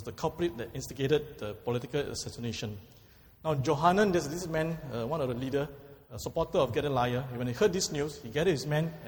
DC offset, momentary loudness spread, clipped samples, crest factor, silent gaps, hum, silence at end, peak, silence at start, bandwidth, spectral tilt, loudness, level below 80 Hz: under 0.1%; 12 LU; under 0.1%; 20 dB; none; none; 0 s; -10 dBFS; 0 s; over 20 kHz; -5.5 dB/octave; -31 LUFS; -54 dBFS